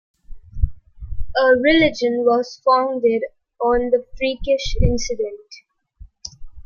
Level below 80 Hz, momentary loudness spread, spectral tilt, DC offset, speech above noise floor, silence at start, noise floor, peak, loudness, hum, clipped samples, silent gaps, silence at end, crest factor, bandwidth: -30 dBFS; 21 LU; -5 dB/octave; under 0.1%; 27 dB; 0.3 s; -45 dBFS; -2 dBFS; -19 LUFS; none; under 0.1%; none; 0.05 s; 16 dB; 7.2 kHz